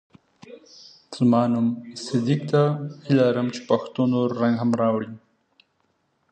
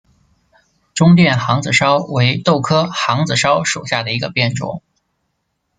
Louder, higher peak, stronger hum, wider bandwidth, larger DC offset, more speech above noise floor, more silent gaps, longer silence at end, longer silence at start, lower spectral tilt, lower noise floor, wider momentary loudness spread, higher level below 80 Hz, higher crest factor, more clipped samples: second, -22 LUFS vs -15 LUFS; second, -6 dBFS vs 0 dBFS; neither; about the same, 9 kHz vs 9.4 kHz; neither; second, 48 dB vs 55 dB; neither; first, 1.15 s vs 1 s; second, 0.5 s vs 0.95 s; first, -7.5 dB/octave vs -5 dB/octave; about the same, -69 dBFS vs -70 dBFS; first, 11 LU vs 7 LU; second, -68 dBFS vs -52 dBFS; about the same, 16 dB vs 16 dB; neither